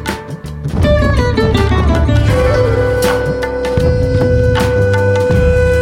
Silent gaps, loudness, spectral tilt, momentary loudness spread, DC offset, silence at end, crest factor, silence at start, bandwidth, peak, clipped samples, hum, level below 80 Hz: none; -13 LUFS; -7 dB/octave; 6 LU; under 0.1%; 0 s; 12 dB; 0 s; 16.5 kHz; 0 dBFS; under 0.1%; none; -18 dBFS